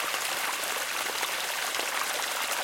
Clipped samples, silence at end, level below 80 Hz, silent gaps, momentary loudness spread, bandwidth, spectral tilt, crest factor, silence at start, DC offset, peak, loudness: under 0.1%; 0 s; -72 dBFS; none; 1 LU; 17 kHz; 1.5 dB/octave; 18 dB; 0 s; under 0.1%; -14 dBFS; -29 LUFS